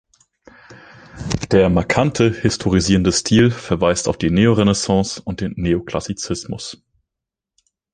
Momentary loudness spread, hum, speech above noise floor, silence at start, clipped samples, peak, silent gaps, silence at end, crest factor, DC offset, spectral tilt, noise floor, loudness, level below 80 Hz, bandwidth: 11 LU; none; 67 dB; 0.7 s; under 0.1%; 0 dBFS; none; 1.2 s; 18 dB; under 0.1%; -5 dB/octave; -84 dBFS; -17 LUFS; -38 dBFS; 10 kHz